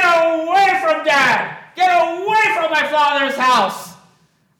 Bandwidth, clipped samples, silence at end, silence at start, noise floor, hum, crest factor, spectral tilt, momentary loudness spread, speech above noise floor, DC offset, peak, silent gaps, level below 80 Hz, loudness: 17.5 kHz; under 0.1%; 0.65 s; 0 s; -57 dBFS; none; 12 dB; -2.5 dB/octave; 5 LU; 41 dB; under 0.1%; -4 dBFS; none; -70 dBFS; -15 LUFS